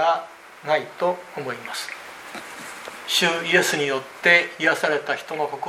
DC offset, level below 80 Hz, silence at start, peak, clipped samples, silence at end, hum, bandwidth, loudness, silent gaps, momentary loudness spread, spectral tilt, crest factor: under 0.1%; -72 dBFS; 0 s; -2 dBFS; under 0.1%; 0 s; none; 16 kHz; -21 LUFS; none; 19 LU; -2.5 dB/octave; 22 dB